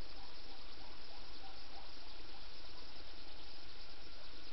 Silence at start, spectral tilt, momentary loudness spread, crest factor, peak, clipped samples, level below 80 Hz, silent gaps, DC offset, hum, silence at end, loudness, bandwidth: 0 s; -2 dB/octave; 1 LU; 14 dB; -32 dBFS; under 0.1%; -58 dBFS; none; 2%; none; 0 s; -54 LUFS; 6 kHz